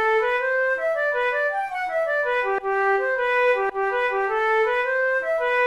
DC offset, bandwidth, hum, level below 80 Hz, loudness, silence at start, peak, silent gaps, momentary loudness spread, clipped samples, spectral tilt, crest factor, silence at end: 0.1%; 12 kHz; none; -58 dBFS; -22 LUFS; 0 s; -10 dBFS; none; 3 LU; under 0.1%; -3 dB/octave; 12 dB; 0 s